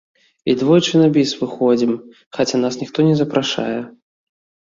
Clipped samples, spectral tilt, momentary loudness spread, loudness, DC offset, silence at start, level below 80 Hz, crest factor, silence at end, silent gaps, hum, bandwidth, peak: under 0.1%; -6 dB/octave; 13 LU; -17 LUFS; under 0.1%; 0.45 s; -58 dBFS; 16 dB; 0.8 s; 2.26-2.31 s; none; 7.6 kHz; -2 dBFS